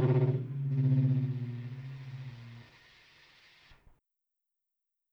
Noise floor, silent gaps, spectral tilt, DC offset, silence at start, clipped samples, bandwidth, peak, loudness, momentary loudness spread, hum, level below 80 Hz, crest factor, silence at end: -87 dBFS; none; -10.5 dB/octave; under 0.1%; 0 s; under 0.1%; 5.2 kHz; -18 dBFS; -32 LUFS; 20 LU; none; -70 dBFS; 16 dB; 2.5 s